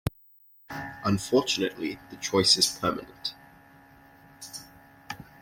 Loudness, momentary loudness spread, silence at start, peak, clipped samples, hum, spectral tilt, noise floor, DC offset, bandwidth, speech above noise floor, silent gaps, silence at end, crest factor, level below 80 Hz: -26 LUFS; 21 LU; 0.05 s; -6 dBFS; under 0.1%; none; -3 dB/octave; -57 dBFS; under 0.1%; 16.5 kHz; 31 dB; none; 0.2 s; 24 dB; -56 dBFS